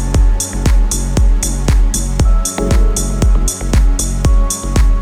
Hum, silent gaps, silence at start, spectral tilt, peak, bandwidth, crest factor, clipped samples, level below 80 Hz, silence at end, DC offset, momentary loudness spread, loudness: none; none; 0 s; -5 dB/octave; 0 dBFS; 13.5 kHz; 10 dB; under 0.1%; -12 dBFS; 0 s; under 0.1%; 2 LU; -15 LUFS